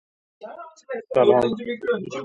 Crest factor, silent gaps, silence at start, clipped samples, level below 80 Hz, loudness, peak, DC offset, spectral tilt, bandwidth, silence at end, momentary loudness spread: 20 dB; none; 0.4 s; under 0.1%; -62 dBFS; -21 LUFS; -4 dBFS; under 0.1%; -6.5 dB/octave; 8.8 kHz; 0 s; 22 LU